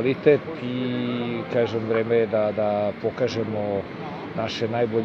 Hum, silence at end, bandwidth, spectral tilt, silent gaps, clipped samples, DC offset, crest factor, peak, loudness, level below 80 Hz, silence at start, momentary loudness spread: none; 0 s; 7 kHz; -7 dB/octave; none; under 0.1%; under 0.1%; 20 dB; -4 dBFS; -24 LUFS; -60 dBFS; 0 s; 9 LU